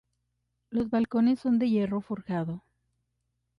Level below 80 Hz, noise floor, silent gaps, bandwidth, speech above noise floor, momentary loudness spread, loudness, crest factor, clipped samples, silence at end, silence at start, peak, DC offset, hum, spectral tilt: -62 dBFS; -79 dBFS; none; 5.6 kHz; 52 dB; 9 LU; -28 LUFS; 14 dB; under 0.1%; 1 s; 0.7 s; -16 dBFS; under 0.1%; 60 Hz at -45 dBFS; -9 dB/octave